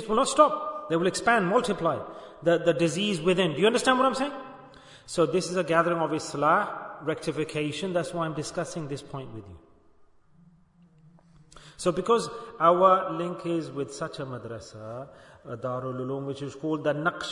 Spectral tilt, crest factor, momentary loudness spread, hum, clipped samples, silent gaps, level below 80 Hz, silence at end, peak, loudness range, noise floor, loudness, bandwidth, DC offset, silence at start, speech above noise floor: -5 dB/octave; 22 dB; 17 LU; none; under 0.1%; none; -62 dBFS; 0 s; -4 dBFS; 10 LU; -59 dBFS; -26 LUFS; 11 kHz; under 0.1%; 0 s; 32 dB